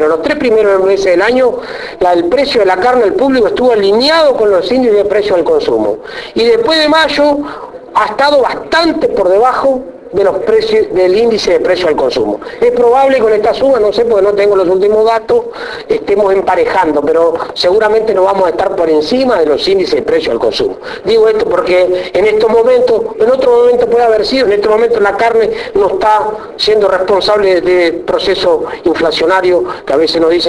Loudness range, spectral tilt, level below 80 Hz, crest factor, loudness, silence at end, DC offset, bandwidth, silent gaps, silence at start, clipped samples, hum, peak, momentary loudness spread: 2 LU; -4.5 dB/octave; -40 dBFS; 10 dB; -10 LUFS; 0 s; under 0.1%; 11 kHz; none; 0 s; under 0.1%; none; 0 dBFS; 5 LU